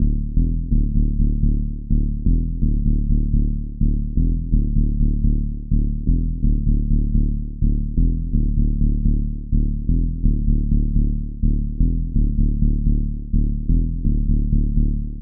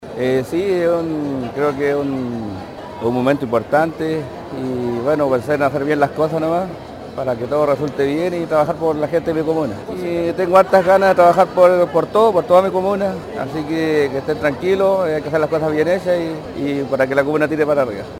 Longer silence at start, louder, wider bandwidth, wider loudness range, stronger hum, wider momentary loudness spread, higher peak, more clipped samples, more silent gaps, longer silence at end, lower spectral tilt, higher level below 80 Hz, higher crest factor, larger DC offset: about the same, 0 s vs 0 s; second, -22 LUFS vs -17 LUFS; second, 0.6 kHz vs 16.5 kHz; second, 1 LU vs 6 LU; neither; second, 3 LU vs 12 LU; second, -4 dBFS vs 0 dBFS; neither; neither; about the same, 0 s vs 0 s; first, -21.5 dB/octave vs -7 dB/octave; first, -18 dBFS vs -48 dBFS; about the same, 14 dB vs 16 dB; neither